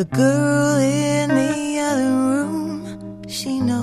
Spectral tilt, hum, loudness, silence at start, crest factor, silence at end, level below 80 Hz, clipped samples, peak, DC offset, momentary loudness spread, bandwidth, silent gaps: -5.5 dB/octave; none; -19 LUFS; 0 s; 14 dB; 0 s; -56 dBFS; under 0.1%; -6 dBFS; under 0.1%; 12 LU; 14 kHz; none